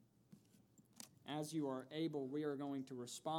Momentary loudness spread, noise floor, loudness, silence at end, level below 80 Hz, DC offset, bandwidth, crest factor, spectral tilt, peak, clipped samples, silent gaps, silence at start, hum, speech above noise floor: 12 LU; -71 dBFS; -45 LUFS; 0 s; under -90 dBFS; under 0.1%; 18 kHz; 16 dB; -5.5 dB/octave; -30 dBFS; under 0.1%; none; 0.3 s; none; 26 dB